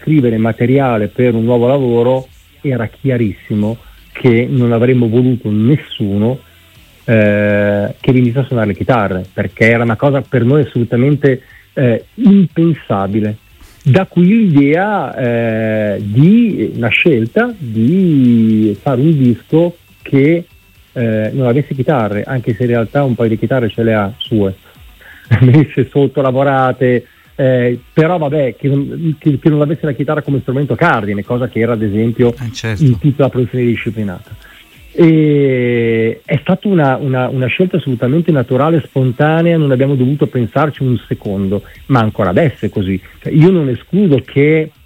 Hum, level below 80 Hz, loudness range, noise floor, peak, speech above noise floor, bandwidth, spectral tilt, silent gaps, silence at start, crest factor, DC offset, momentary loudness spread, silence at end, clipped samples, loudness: none; -46 dBFS; 3 LU; -43 dBFS; 0 dBFS; 31 dB; 15.5 kHz; -9 dB/octave; none; 0 s; 12 dB; under 0.1%; 8 LU; 0.15 s; under 0.1%; -13 LUFS